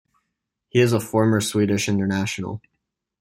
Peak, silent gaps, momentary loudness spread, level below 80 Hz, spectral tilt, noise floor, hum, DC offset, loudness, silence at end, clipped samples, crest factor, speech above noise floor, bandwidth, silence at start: -4 dBFS; none; 11 LU; -58 dBFS; -5.5 dB/octave; -79 dBFS; none; under 0.1%; -21 LUFS; 0.65 s; under 0.1%; 18 dB; 59 dB; 16.5 kHz; 0.75 s